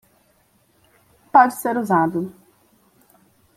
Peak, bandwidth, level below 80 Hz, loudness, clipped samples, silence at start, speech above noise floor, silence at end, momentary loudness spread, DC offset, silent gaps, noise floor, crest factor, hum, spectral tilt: -2 dBFS; 16 kHz; -64 dBFS; -18 LUFS; under 0.1%; 1.35 s; 43 dB; 1.25 s; 12 LU; under 0.1%; none; -61 dBFS; 20 dB; none; -6.5 dB/octave